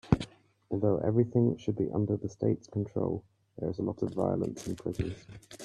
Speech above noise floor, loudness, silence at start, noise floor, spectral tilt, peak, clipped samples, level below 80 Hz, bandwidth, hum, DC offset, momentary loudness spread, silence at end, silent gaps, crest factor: 19 dB; -32 LUFS; 0.05 s; -50 dBFS; -8.5 dB/octave; -8 dBFS; under 0.1%; -52 dBFS; 12.5 kHz; none; under 0.1%; 11 LU; 0 s; none; 22 dB